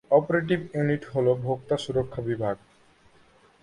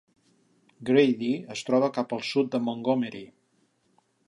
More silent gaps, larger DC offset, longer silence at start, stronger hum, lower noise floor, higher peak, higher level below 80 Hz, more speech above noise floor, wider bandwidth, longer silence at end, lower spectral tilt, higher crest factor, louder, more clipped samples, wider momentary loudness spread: neither; neither; second, 0.1 s vs 0.8 s; neither; second, -58 dBFS vs -69 dBFS; about the same, -6 dBFS vs -8 dBFS; first, -56 dBFS vs -78 dBFS; second, 33 dB vs 43 dB; about the same, 11 kHz vs 11 kHz; about the same, 1.05 s vs 1 s; first, -7.5 dB/octave vs -6 dB/octave; about the same, 20 dB vs 20 dB; about the same, -26 LUFS vs -26 LUFS; neither; second, 7 LU vs 11 LU